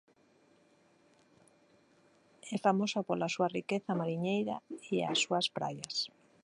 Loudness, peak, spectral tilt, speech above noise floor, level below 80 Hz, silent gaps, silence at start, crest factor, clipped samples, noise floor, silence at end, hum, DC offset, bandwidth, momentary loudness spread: -34 LUFS; -14 dBFS; -4.5 dB/octave; 34 dB; -80 dBFS; none; 2.45 s; 22 dB; under 0.1%; -67 dBFS; 0.35 s; none; under 0.1%; 11 kHz; 9 LU